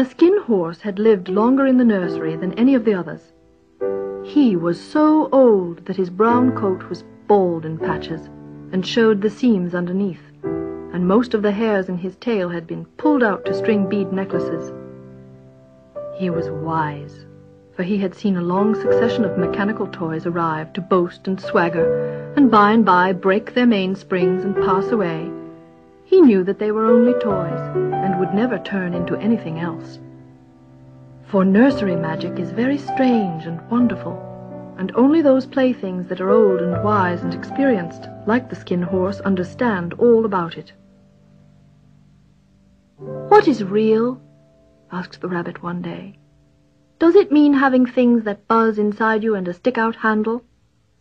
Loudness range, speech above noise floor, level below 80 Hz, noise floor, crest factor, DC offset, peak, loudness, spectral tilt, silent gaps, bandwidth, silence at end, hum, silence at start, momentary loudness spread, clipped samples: 6 LU; 42 dB; -54 dBFS; -60 dBFS; 18 dB; under 0.1%; 0 dBFS; -18 LUFS; -8 dB/octave; none; 7.4 kHz; 0.6 s; none; 0 s; 14 LU; under 0.1%